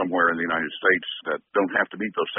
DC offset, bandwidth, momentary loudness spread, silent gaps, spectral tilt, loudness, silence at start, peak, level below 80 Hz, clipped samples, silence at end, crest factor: under 0.1%; 3.9 kHz; 6 LU; none; -1.5 dB/octave; -24 LUFS; 0 s; -6 dBFS; -66 dBFS; under 0.1%; 0 s; 18 dB